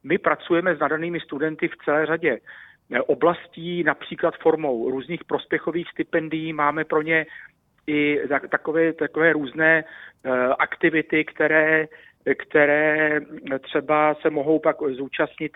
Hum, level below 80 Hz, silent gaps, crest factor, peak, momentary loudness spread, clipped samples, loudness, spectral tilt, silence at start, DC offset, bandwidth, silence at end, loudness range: none; -64 dBFS; none; 20 dB; -2 dBFS; 9 LU; under 0.1%; -22 LUFS; -9 dB/octave; 0.05 s; under 0.1%; 4 kHz; 0.1 s; 4 LU